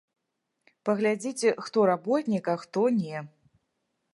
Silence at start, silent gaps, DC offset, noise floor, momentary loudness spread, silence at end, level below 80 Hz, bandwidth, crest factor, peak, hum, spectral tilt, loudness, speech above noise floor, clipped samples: 0.85 s; none; under 0.1%; -81 dBFS; 8 LU; 0.85 s; -78 dBFS; 11.5 kHz; 18 dB; -10 dBFS; none; -5.5 dB/octave; -27 LUFS; 55 dB; under 0.1%